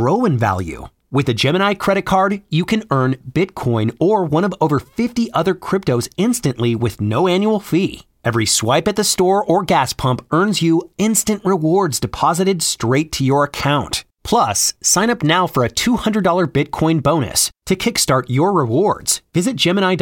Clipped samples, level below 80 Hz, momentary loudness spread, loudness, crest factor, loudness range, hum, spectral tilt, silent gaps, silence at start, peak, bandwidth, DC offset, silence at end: under 0.1%; -44 dBFS; 5 LU; -17 LUFS; 14 dB; 2 LU; none; -4.5 dB/octave; none; 0 s; -2 dBFS; 17 kHz; under 0.1%; 0 s